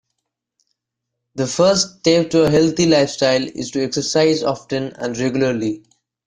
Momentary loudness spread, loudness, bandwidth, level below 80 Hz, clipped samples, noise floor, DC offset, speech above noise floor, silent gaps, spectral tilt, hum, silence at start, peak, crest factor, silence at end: 10 LU; -17 LUFS; 10.5 kHz; -52 dBFS; under 0.1%; -80 dBFS; under 0.1%; 63 dB; none; -4.5 dB/octave; none; 1.35 s; -2 dBFS; 18 dB; 0.5 s